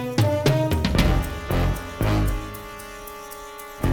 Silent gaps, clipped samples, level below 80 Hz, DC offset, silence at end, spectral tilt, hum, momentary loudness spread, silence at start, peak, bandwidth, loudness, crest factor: none; under 0.1%; -30 dBFS; under 0.1%; 0 s; -6 dB/octave; none; 16 LU; 0 s; -4 dBFS; over 20 kHz; -23 LUFS; 18 dB